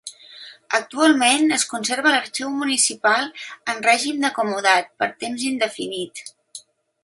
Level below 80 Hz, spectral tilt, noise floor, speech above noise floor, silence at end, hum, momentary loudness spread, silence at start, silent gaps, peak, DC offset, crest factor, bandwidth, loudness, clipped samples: -74 dBFS; -1 dB/octave; -44 dBFS; 24 dB; 0.45 s; none; 21 LU; 0.05 s; none; -2 dBFS; under 0.1%; 20 dB; 11.5 kHz; -20 LUFS; under 0.1%